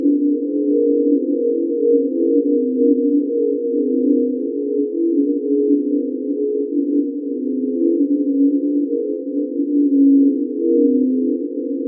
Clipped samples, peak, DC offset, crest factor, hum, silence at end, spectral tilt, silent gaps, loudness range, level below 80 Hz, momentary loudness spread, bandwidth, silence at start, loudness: under 0.1%; -4 dBFS; under 0.1%; 12 dB; none; 0 s; -16 dB/octave; none; 2 LU; under -90 dBFS; 6 LU; 0.6 kHz; 0 s; -18 LUFS